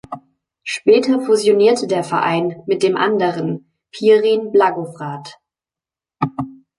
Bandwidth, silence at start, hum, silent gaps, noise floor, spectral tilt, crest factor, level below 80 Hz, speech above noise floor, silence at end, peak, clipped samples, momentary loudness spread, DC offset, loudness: 11.5 kHz; 0.1 s; none; none; -89 dBFS; -5.5 dB/octave; 16 dB; -62 dBFS; 74 dB; 0.25 s; -2 dBFS; under 0.1%; 16 LU; under 0.1%; -16 LUFS